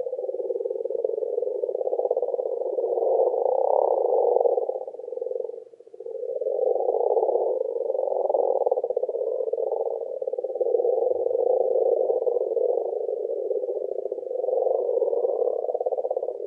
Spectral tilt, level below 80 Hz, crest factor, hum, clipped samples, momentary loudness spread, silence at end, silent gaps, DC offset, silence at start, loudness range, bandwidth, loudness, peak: -8 dB/octave; under -90 dBFS; 18 dB; none; under 0.1%; 8 LU; 0 s; none; under 0.1%; 0 s; 2 LU; 1.2 kHz; -25 LUFS; -8 dBFS